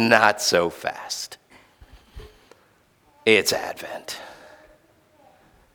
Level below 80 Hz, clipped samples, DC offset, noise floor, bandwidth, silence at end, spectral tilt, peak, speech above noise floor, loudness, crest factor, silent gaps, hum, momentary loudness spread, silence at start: -54 dBFS; under 0.1%; under 0.1%; -60 dBFS; 19.5 kHz; 1.4 s; -2.5 dB/octave; 0 dBFS; 38 dB; -22 LUFS; 26 dB; none; none; 19 LU; 0 s